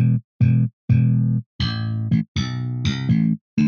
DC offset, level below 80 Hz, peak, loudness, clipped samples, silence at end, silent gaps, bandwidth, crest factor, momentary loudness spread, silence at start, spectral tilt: under 0.1%; -44 dBFS; -6 dBFS; -21 LUFS; under 0.1%; 0 s; 0.24-0.40 s, 0.73-0.88 s, 1.46-1.59 s, 2.28-2.35 s, 3.41-3.57 s; 6.8 kHz; 14 dB; 7 LU; 0 s; -7.5 dB/octave